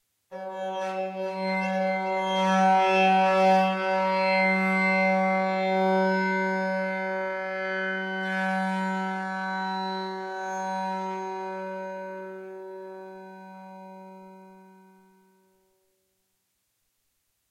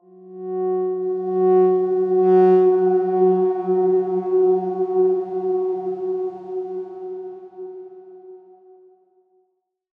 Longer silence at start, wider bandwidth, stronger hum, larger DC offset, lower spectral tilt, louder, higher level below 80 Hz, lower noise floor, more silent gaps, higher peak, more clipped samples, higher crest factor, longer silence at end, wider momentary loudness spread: about the same, 0.3 s vs 0.2 s; first, 11 kHz vs 2.9 kHz; neither; neither; second, -6 dB/octave vs -11 dB/octave; second, -26 LUFS vs -19 LUFS; second, -86 dBFS vs -78 dBFS; first, -75 dBFS vs -70 dBFS; neither; second, -10 dBFS vs -6 dBFS; neither; about the same, 16 dB vs 14 dB; first, 2.9 s vs 1.6 s; about the same, 20 LU vs 19 LU